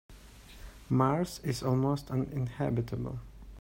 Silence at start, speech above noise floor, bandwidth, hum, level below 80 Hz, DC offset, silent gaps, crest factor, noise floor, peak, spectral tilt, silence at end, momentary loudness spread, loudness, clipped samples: 0.1 s; 21 dB; 16 kHz; none; -52 dBFS; under 0.1%; none; 20 dB; -51 dBFS; -12 dBFS; -7 dB/octave; 0 s; 23 LU; -32 LUFS; under 0.1%